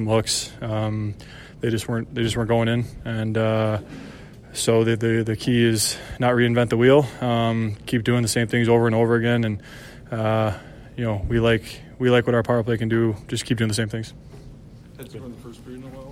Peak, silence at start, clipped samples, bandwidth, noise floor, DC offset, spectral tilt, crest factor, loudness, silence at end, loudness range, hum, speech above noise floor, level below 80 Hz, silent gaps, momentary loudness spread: -4 dBFS; 0 s; under 0.1%; 16 kHz; -43 dBFS; under 0.1%; -5.5 dB/octave; 18 dB; -22 LUFS; 0 s; 5 LU; none; 22 dB; -44 dBFS; none; 20 LU